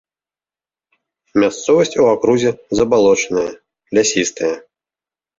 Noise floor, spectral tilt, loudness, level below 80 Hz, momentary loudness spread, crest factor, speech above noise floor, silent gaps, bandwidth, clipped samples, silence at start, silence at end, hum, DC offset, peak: under -90 dBFS; -4 dB/octave; -16 LUFS; -50 dBFS; 9 LU; 14 dB; over 75 dB; none; 7.8 kHz; under 0.1%; 1.35 s; 0.8 s; none; under 0.1%; -2 dBFS